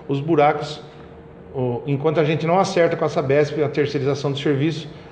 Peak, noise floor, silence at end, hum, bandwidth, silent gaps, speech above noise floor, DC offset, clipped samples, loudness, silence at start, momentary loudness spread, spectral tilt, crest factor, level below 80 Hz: -4 dBFS; -41 dBFS; 0 s; none; 9.2 kHz; none; 21 dB; under 0.1%; under 0.1%; -20 LUFS; 0 s; 12 LU; -6.5 dB/octave; 16 dB; -54 dBFS